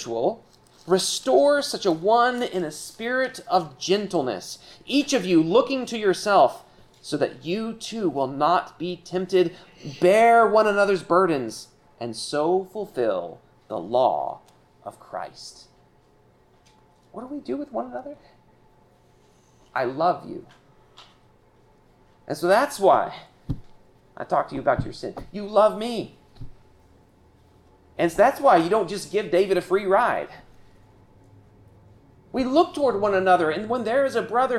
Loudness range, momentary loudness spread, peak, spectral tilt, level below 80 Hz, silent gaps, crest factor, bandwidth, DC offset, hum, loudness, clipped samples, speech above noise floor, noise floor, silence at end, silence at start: 11 LU; 18 LU; -6 dBFS; -4.5 dB/octave; -54 dBFS; none; 18 dB; 14.5 kHz; under 0.1%; none; -22 LUFS; under 0.1%; 36 dB; -58 dBFS; 0 s; 0 s